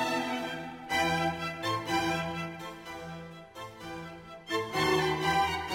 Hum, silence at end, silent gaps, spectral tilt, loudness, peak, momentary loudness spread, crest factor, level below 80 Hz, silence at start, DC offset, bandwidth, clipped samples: none; 0 s; none; -4 dB/octave; -31 LUFS; -16 dBFS; 17 LU; 16 dB; -60 dBFS; 0 s; under 0.1%; 16.5 kHz; under 0.1%